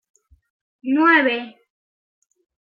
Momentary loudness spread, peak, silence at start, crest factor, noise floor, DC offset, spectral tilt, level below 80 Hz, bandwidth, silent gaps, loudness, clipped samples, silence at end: 19 LU; -4 dBFS; 0.85 s; 20 dB; under -90 dBFS; under 0.1%; -5 dB/octave; -68 dBFS; 7 kHz; none; -17 LUFS; under 0.1%; 1.2 s